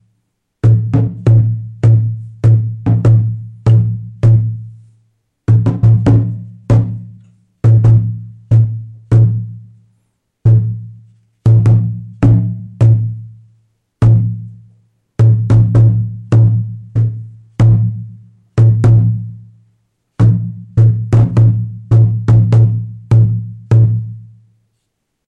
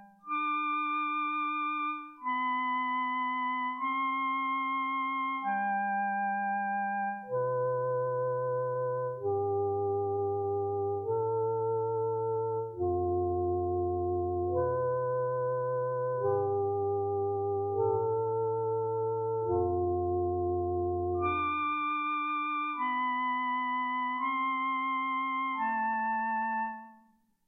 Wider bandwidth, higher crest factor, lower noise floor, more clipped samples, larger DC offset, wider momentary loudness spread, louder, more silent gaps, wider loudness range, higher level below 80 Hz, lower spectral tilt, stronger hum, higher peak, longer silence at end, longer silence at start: second, 3 kHz vs 3.8 kHz; about the same, 10 dB vs 14 dB; first, -70 dBFS vs -66 dBFS; neither; neither; first, 12 LU vs 2 LU; first, -12 LUFS vs -31 LUFS; neither; about the same, 3 LU vs 1 LU; first, -34 dBFS vs -62 dBFS; about the same, -10 dB/octave vs -9.5 dB/octave; neither; first, -2 dBFS vs -18 dBFS; first, 1.05 s vs 0.5 s; first, 0.65 s vs 0 s